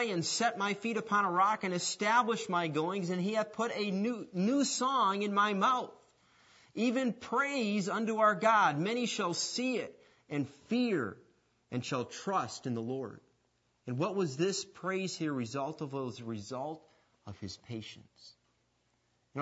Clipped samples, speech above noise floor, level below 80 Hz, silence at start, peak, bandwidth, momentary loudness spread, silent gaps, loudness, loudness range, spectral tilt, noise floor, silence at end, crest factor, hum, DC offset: under 0.1%; 43 dB; -80 dBFS; 0 s; -14 dBFS; 8 kHz; 14 LU; none; -33 LUFS; 8 LU; -4 dB/octave; -75 dBFS; 0 s; 20 dB; none; under 0.1%